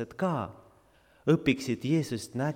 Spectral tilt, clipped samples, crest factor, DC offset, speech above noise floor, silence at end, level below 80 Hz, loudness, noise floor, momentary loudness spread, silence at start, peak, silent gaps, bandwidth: -6.5 dB/octave; under 0.1%; 20 dB; under 0.1%; 33 dB; 0 s; -60 dBFS; -29 LUFS; -62 dBFS; 9 LU; 0 s; -10 dBFS; none; 16 kHz